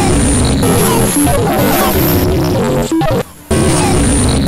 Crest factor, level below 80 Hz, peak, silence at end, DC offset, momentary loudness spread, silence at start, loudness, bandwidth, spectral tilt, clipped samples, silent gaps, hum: 10 dB; -22 dBFS; -2 dBFS; 0 s; 2%; 3 LU; 0 s; -12 LUFS; 16.5 kHz; -5 dB/octave; under 0.1%; none; none